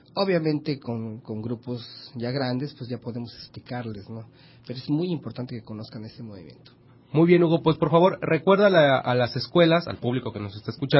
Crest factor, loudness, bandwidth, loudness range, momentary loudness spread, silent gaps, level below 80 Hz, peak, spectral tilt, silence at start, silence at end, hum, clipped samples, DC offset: 20 dB; -24 LUFS; 5.8 kHz; 13 LU; 20 LU; none; -60 dBFS; -6 dBFS; -11 dB/octave; 0.15 s; 0 s; none; under 0.1%; under 0.1%